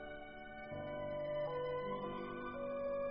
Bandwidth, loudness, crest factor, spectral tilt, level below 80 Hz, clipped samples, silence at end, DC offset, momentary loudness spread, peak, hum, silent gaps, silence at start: 5.4 kHz; -43 LUFS; 12 dB; -4.5 dB/octave; -62 dBFS; under 0.1%; 0 s; under 0.1%; 10 LU; -30 dBFS; none; none; 0 s